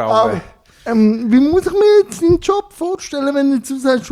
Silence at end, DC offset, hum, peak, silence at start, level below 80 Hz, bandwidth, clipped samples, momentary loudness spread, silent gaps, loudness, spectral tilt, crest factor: 0 s; under 0.1%; none; -2 dBFS; 0 s; -42 dBFS; 14.5 kHz; under 0.1%; 10 LU; none; -15 LUFS; -6 dB/octave; 12 dB